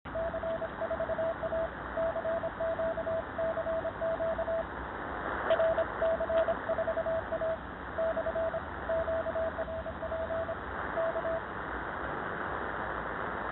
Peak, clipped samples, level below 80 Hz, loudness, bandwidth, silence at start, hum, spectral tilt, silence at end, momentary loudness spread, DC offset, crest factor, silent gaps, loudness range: -18 dBFS; under 0.1%; -50 dBFS; -34 LUFS; 4.2 kHz; 0.05 s; none; -4.5 dB/octave; 0 s; 7 LU; under 0.1%; 16 dB; none; 4 LU